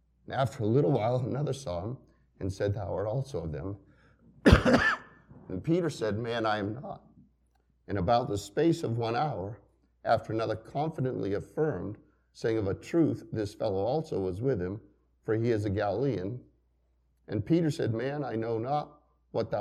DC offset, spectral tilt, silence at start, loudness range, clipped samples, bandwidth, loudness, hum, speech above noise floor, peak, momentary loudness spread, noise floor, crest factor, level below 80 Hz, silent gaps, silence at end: under 0.1%; -7 dB/octave; 0.3 s; 5 LU; under 0.1%; 14 kHz; -30 LUFS; none; 41 dB; -4 dBFS; 12 LU; -70 dBFS; 26 dB; -46 dBFS; none; 0 s